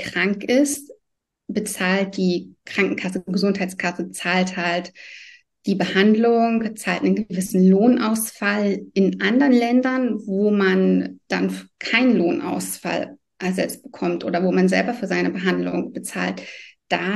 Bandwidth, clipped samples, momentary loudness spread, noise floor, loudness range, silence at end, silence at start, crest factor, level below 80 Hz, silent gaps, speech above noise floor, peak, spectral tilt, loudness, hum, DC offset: 12.5 kHz; under 0.1%; 11 LU; -77 dBFS; 5 LU; 0 s; 0 s; 18 dB; -64 dBFS; none; 57 dB; -2 dBFS; -5.5 dB/octave; -21 LUFS; none; under 0.1%